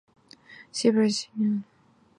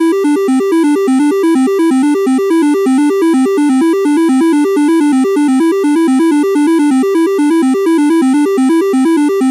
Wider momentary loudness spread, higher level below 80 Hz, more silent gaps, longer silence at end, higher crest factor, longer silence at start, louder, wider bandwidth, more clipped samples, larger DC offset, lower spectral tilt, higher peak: first, 10 LU vs 1 LU; about the same, -76 dBFS vs -76 dBFS; neither; first, 0.55 s vs 0 s; first, 18 dB vs 6 dB; first, 0.5 s vs 0 s; second, -26 LUFS vs -11 LUFS; second, 11 kHz vs 13.5 kHz; neither; neither; about the same, -5 dB/octave vs -4 dB/octave; second, -8 dBFS vs -4 dBFS